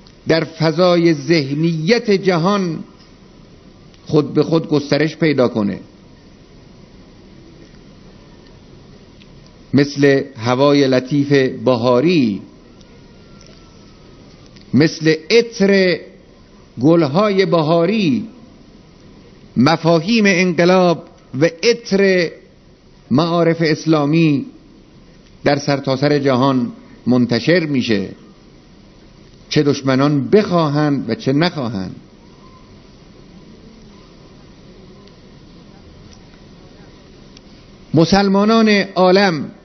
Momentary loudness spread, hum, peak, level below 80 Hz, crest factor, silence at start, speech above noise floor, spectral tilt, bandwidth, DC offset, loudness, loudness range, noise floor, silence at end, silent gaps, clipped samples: 8 LU; none; 0 dBFS; -50 dBFS; 18 dB; 0.25 s; 32 dB; -6.5 dB/octave; 6.4 kHz; under 0.1%; -15 LUFS; 6 LU; -46 dBFS; 0.1 s; none; under 0.1%